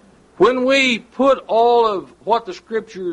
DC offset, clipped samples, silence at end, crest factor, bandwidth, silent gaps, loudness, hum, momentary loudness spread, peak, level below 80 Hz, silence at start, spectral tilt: under 0.1%; under 0.1%; 0 s; 14 dB; 11 kHz; none; -17 LUFS; none; 12 LU; -4 dBFS; -54 dBFS; 0.4 s; -4 dB/octave